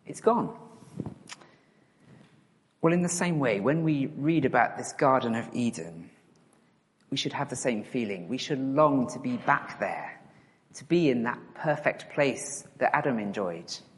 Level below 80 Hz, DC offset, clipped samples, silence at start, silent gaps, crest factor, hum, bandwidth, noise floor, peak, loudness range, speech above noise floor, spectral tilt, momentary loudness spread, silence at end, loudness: -70 dBFS; under 0.1%; under 0.1%; 0.05 s; none; 22 dB; none; 11.5 kHz; -65 dBFS; -8 dBFS; 5 LU; 38 dB; -5 dB/octave; 16 LU; 0.15 s; -28 LUFS